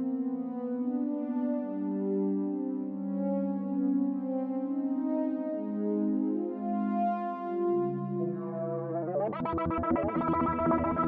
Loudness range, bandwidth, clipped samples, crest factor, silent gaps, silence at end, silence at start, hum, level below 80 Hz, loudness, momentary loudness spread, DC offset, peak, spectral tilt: 1 LU; 3.8 kHz; under 0.1%; 14 dB; none; 0 s; 0 s; none; -56 dBFS; -31 LUFS; 5 LU; under 0.1%; -16 dBFS; -12 dB/octave